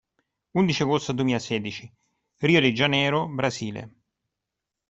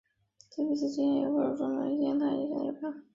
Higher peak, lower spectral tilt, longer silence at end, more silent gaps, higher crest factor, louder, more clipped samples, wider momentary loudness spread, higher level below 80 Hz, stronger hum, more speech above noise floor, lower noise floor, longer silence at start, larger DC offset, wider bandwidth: first, -6 dBFS vs -18 dBFS; about the same, -5.5 dB/octave vs -6.5 dB/octave; first, 1 s vs 0.15 s; neither; first, 20 dB vs 14 dB; first, -24 LUFS vs -31 LUFS; neither; first, 14 LU vs 7 LU; first, -60 dBFS vs -74 dBFS; neither; first, 61 dB vs 32 dB; first, -85 dBFS vs -62 dBFS; about the same, 0.55 s vs 0.55 s; neither; about the same, 8.2 kHz vs 7.6 kHz